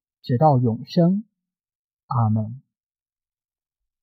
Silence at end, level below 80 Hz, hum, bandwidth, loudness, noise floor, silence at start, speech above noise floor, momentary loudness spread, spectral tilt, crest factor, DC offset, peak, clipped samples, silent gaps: 1.45 s; -62 dBFS; none; 6 kHz; -21 LUFS; under -90 dBFS; 0.25 s; over 71 dB; 10 LU; -10 dB/octave; 18 dB; under 0.1%; -6 dBFS; under 0.1%; 1.75-1.97 s, 2.03-2.08 s